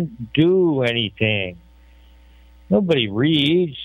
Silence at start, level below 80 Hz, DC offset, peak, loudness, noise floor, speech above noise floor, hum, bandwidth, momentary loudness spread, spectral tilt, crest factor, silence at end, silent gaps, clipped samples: 0 s; -50 dBFS; under 0.1%; -4 dBFS; -18 LUFS; -48 dBFS; 29 dB; none; 9.2 kHz; 6 LU; -7.5 dB/octave; 16 dB; 0 s; none; under 0.1%